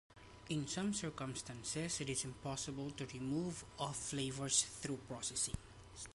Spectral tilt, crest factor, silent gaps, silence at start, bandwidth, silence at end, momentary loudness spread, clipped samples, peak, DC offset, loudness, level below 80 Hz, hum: -3.5 dB/octave; 24 dB; none; 0.1 s; 11.5 kHz; 0 s; 11 LU; under 0.1%; -20 dBFS; under 0.1%; -41 LUFS; -62 dBFS; none